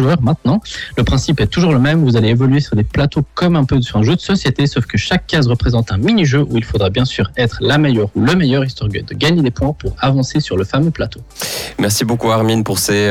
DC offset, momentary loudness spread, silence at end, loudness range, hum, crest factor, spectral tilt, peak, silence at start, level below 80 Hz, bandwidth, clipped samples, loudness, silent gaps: under 0.1%; 6 LU; 0 s; 3 LU; none; 10 dB; -6 dB/octave; -4 dBFS; 0 s; -32 dBFS; 17 kHz; under 0.1%; -15 LUFS; none